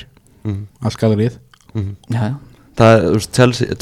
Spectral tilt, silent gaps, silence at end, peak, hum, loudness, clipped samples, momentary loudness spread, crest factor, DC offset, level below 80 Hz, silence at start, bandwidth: -6.5 dB/octave; none; 0.05 s; 0 dBFS; none; -16 LUFS; under 0.1%; 17 LU; 16 dB; under 0.1%; -44 dBFS; 0 s; 14 kHz